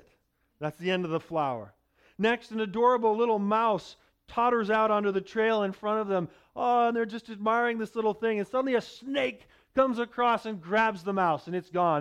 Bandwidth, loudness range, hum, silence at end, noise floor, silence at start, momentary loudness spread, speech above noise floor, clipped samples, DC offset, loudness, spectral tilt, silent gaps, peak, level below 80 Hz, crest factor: 11.5 kHz; 2 LU; none; 0 s; -71 dBFS; 0.6 s; 8 LU; 44 dB; under 0.1%; under 0.1%; -28 LUFS; -6.5 dB/octave; none; -12 dBFS; -66 dBFS; 16 dB